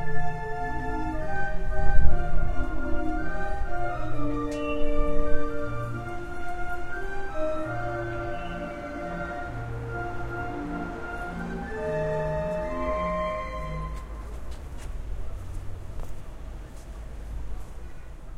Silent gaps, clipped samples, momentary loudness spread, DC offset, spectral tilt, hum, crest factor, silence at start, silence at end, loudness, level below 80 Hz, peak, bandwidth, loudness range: none; under 0.1%; 12 LU; under 0.1%; -7 dB/octave; none; 22 dB; 0 s; 0 s; -32 LUFS; -32 dBFS; -2 dBFS; 4.5 kHz; 9 LU